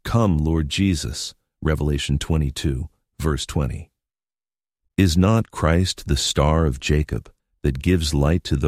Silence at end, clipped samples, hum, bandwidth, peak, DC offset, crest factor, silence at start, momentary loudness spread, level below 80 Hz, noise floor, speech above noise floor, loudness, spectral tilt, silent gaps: 0 s; under 0.1%; none; 15 kHz; -2 dBFS; under 0.1%; 18 dB; 0.05 s; 10 LU; -30 dBFS; under -90 dBFS; over 70 dB; -21 LUFS; -5.5 dB/octave; none